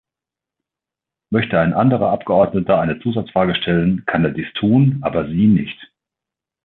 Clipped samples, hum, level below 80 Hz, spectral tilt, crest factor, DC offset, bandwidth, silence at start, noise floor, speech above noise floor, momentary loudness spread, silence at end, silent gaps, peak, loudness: under 0.1%; none; -46 dBFS; -11 dB/octave; 14 dB; under 0.1%; 4.2 kHz; 1.3 s; -87 dBFS; 71 dB; 6 LU; 0.8 s; none; -2 dBFS; -17 LUFS